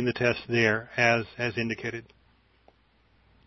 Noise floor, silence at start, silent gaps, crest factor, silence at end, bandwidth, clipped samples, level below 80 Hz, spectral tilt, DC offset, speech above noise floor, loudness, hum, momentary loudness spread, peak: -64 dBFS; 0 s; none; 22 dB; 1.45 s; 6.2 kHz; under 0.1%; -60 dBFS; -5.5 dB/octave; under 0.1%; 37 dB; -26 LUFS; none; 10 LU; -8 dBFS